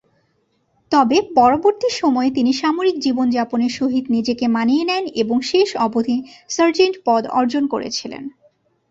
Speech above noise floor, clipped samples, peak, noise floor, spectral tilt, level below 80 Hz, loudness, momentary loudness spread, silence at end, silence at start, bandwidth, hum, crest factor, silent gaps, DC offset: 47 dB; under 0.1%; -2 dBFS; -65 dBFS; -4 dB/octave; -58 dBFS; -18 LUFS; 8 LU; 0.6 s; 0.9 s; 7.8 kHz; none; 16 dB; none; under 0.1%